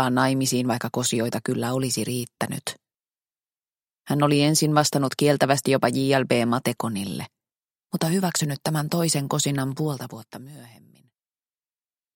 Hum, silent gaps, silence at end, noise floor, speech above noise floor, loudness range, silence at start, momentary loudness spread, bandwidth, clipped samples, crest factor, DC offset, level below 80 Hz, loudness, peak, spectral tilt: none; none; 1.5 s; under -90 dBFS; over 67 dB; 7 LU; 0 s; 14 LU; 17 kHz; under 0.1%; 22 dB; under 0.1%; -64 dBFS; -23 LUFS; -2 dBFS; -4.5 dB/octave